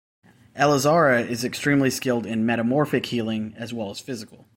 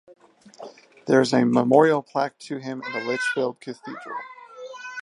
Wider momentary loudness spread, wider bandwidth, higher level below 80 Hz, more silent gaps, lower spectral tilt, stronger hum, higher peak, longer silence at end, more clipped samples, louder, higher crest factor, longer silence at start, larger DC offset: second, 14 LU vs 23 LU; first, 16.5 kHz vs 11 kHz; first, -60 dBFS vs -76 dBFS; neither; about the same, -5 dB/octave vs -5.5 dB/octave; neither; second, -6 dBFS vs -2 dBFS; first, 0.3 s vs 0 s; neither; about the same, -22 LUFS vs -22 LUFS; about the same, 18 dB vs 22 dB; about the same, 0.55 s vs 0.6 s; neither